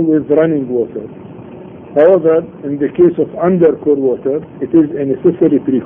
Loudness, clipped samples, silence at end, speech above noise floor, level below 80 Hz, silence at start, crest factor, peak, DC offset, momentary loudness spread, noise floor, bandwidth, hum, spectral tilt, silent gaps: -13 LUFS; under 0.1%; 0 s; 20 dB; -52 dBFS; 0 s; 12 dB; 0 dBFS; under 0.1%; 19 LU; -32 dBFS; 3.5 kHz; none; -11.5 dB/octave; none